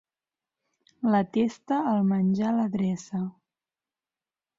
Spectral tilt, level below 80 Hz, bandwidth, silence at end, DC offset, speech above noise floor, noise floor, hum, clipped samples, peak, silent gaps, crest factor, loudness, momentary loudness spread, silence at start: -8 dB/octave; -68 dBFS; 7.6 kHz; 1.25 s; under 0.1%; over 65 dB; under -90 dBFS; none; under 0.1%; -12 dBFS; none; 16 dB; -26 LUFS; 8 LU; 1 s